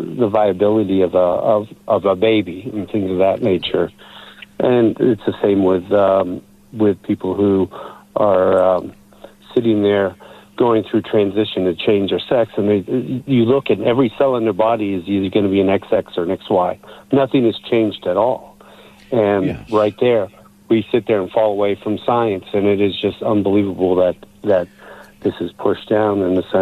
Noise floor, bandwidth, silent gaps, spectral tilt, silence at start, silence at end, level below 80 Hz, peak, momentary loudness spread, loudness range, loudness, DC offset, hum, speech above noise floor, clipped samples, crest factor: -43 dBFS; 13 kHz; none; -8 dB/octave; 0 s; 0 s; -54 dBFS; -4 dBFS; 7 LU; 2 LU; -17 LUFS; under 0.1%; none; 27 dB; under 0.1%; 14 dB